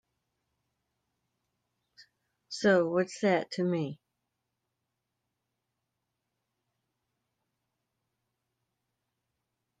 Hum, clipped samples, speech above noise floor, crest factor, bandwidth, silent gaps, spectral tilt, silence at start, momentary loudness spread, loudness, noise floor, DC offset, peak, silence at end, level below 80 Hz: none; under 0.1%; 57 dB; 24 dB; 9.4 kHz; none; -6 dB/octave; 2.5 s; 11 LU; -29 LUFS; -85 dBFS; under 0.1%; -12 dBFS; 5.85 s; -82 dBFS